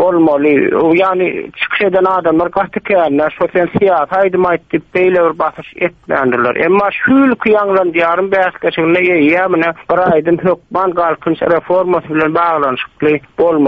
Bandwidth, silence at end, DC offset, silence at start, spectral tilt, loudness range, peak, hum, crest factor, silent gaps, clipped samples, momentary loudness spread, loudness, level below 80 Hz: 5.4 kHz; 0 s; under 0.1%; 0 s; -8.5 dB/octave; 2 LU; 0 dBFS; none; 12 dB; none; under 0.1%; 5 LU; -12 LUFS; -48 dBFS